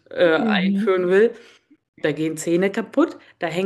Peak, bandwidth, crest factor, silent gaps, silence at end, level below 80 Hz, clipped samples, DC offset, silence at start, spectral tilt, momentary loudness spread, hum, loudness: -4 dBFS; 12.5 kHz; 16 dB; 1.88-1.93 s; 0 s; -70 dBFS; under 0.1%; under 0.1%; 0.1 s; -5.5 dB/octave; 8 LU; none; -20 LUFS